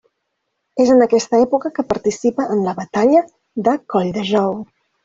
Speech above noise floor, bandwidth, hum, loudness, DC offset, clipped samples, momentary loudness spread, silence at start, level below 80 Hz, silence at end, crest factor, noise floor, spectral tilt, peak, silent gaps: 57 dB; 7.8 kHz; none; -17 LUFS; under 0.1%; under 0.1%; 8 LU; 0.75 s; -56 dBFS; 0.4 s; 16 dB; -73 dBFS; -5.5 dB/octave; 0 dBFS; none